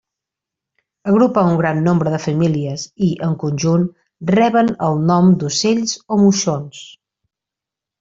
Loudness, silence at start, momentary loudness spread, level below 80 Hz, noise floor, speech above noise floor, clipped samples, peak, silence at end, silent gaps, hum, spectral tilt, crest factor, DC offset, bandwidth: -16 LUFS; 1.05 s; 11 LU; -54 dBFS; -85 dBFS; 70 dB; under 0.1%; -2 dBFS; 1.1 s; none; none; -6 dB/octave; 14 dB; under 0.1%; 7.8 kHz